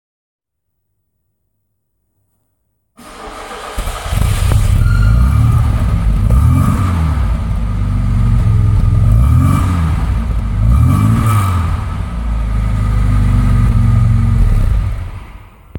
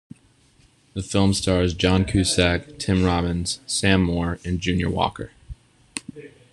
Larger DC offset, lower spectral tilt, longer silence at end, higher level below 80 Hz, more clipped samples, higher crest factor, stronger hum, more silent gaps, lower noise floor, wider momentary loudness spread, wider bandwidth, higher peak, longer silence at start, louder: neither; first, -7 dB/octave vs -5 dB/octave; second, 0 s vs 0.25 s; first, -16 dBFS vs -42 dBFS; neither; second, 12 dB vs 20 dB; neither; neither; first, -71 dBFS vs -57 dBFS; second, 10 LU vs 15 LU; first, 17 kHz vs 12.5 kHz; about the same, 0 dBFS vs -2 dBFS; first, 3 s vs 0.95 s; first, -14 LUFS vs -21 LUFS